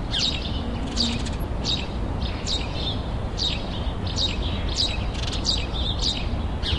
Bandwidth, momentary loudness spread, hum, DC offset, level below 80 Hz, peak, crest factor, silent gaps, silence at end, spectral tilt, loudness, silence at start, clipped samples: 12 kHz; 5 LU; none; 0.3%; -30 dBFS; -10 dBFS; 16 dB; none; 0 s; -4 dB/octave; -26 LUFS; 0 s; under 0.1%